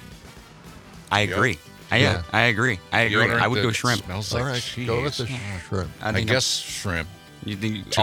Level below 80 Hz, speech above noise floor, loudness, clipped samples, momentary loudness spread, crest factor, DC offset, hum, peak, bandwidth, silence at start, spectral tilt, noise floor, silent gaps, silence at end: -50 dBFS; 22 dB; -23 LUFS; under 0.1%; 11 LU; 22 dB; under 0.1%; none; -2 dBFS; 18 kHz; 0 s; -4 dB/octave; -45 dBFS; none; 0 s